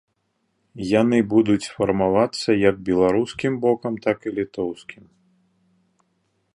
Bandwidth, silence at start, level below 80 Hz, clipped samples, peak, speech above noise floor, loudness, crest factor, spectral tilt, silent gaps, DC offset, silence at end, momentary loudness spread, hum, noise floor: 11 kHz; 0.75 s; -54 dBFS; under 0.1%; -4 dBFS; 51 dB; -21 LUFS; 18 dB; -6.5 dB/octave; none; under 0.1%; 1.6 s; 10 LU; none; -71 dBFS